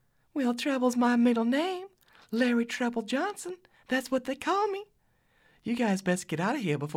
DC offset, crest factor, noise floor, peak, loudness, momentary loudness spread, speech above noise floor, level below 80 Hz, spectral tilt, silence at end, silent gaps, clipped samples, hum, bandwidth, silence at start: under 0.1%; 16 dB; -68 dBFS; -14 dBFS; -29 LUFS; 14 LU; 40 dB; -72 dBFS; -5 dB/octave; 0 s; none; under 0.1%; none; 15.5 kHz; 0.35 s